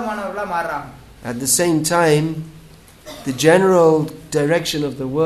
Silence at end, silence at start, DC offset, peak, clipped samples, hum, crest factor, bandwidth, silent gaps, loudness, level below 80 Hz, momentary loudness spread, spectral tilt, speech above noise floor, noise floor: 0 s; 0 s; under 0.1%; 0 dBFS; under 0.1%; none; 18 dB; 13.5 kHz; none; -17 LUFS; -50 dBFS; 17 LU; -4.5 dB/octave; 26 dB; -43 dBFS